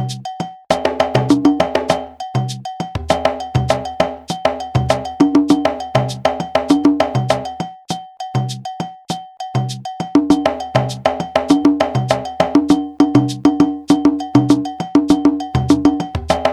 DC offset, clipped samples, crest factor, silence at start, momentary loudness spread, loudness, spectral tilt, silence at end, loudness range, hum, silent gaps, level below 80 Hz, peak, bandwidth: under 0.1%; under 0.1%; 16 dB; 0 s; 12 LU; -17 LUFS; -6.5 dB/octave; 0 s; 5 LU; none; none; -40 dBFS; 0 dBFS; 12 kHz